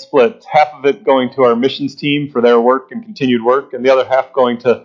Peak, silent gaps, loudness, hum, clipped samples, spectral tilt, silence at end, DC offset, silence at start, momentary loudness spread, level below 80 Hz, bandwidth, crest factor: 0 dBFS; none; -13 LUFS; none; under 0.1%; -6.5 dB/octave; 0.05 s; under 0.1%; 0 s; 6 LU; -60 dBFS; 7.2 kHz; 14 dB